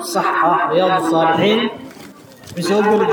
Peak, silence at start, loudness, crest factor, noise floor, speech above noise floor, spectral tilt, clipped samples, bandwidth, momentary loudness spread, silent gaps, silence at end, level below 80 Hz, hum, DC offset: -4 dBFS; 0 s; -16 LUFS; 12 dB; -39 dBFS; 24 dB; -5 dB/octave; under 0.1%; over 20 kHz; 15 LU; none; 0 s; -64 dBFS; none; under 0.1%